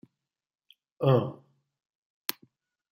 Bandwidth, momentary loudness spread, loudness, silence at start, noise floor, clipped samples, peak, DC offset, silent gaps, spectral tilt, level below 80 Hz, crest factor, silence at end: 16 kHz; 13 LU; -29 LUFS; 1 s; -82 dBFS; under 0.1%; -8 dBFS; under 0.1%; none; -6.5 dB/octave; -74 dBFS; 24 dB; 1.6 s